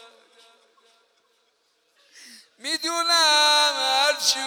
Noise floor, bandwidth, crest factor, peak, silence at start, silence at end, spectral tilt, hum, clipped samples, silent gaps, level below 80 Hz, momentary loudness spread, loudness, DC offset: -68 dBFS; 19.5 kHz; 20 dB; -6 dBFS; 2.65 s; 0 s; 2.5 dB/octave; none; under 0.1%; none; under -90 dBFS; 11 LU; -19 LUFS; under 0.1%